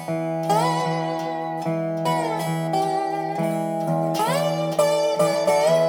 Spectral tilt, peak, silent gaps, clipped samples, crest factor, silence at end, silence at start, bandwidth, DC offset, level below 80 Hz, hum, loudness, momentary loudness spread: -5.5 dB/octave; -6 dBFS; none; under 0.1%; 16 dB; 0 s; 0 s; 18 kHz; under 0.1%; -74 dBFS; none; -23 LUFS; 6 LU